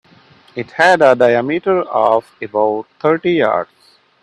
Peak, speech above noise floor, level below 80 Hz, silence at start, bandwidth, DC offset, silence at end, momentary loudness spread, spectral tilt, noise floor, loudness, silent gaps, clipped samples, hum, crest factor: 0 dBFS; 33 dB; -60 dBFS; 0.55 s; 11.5 kHz; under 0.1%; 0.6 s; 14 LU; -5.5 dB/octave; -47 dBFS; -14 LUFS; none; under 0.1%; none; 16 dB